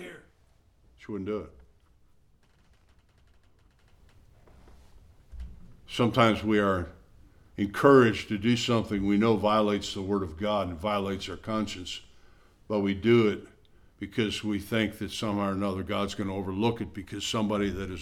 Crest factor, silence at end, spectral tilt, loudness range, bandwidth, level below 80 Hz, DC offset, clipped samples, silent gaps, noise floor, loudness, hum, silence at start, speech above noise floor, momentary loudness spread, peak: 22 dB; 0 s; -6 dB/octave; 18 LU; 15.5 kHz; -52 dBFS; under 0.1%; under 0.1%; none; -63 dBFS; -27 LUFS; none; 0 s; 36 dB; 16 LU; -6 dBFS